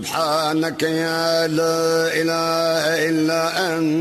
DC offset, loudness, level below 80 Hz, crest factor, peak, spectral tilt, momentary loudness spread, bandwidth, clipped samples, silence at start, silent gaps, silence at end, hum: under 0.1%; -19 LUFS; -62 dBFS; 12 dB; -6 dBFS; -4 dB/octave; 2 LU; 13.5 kHz; under 0.1%; 0 s; none; 0 s; none